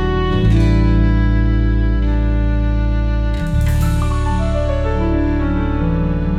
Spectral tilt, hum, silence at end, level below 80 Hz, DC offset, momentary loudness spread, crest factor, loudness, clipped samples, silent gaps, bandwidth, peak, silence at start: -8 dB/octave; none; 0 s; -16 dBFS; under 0.1%; 4 LU; 12 dB; -17 LUFS; under 0.1%; none; 12 kHz; -4 dBFS; 0 s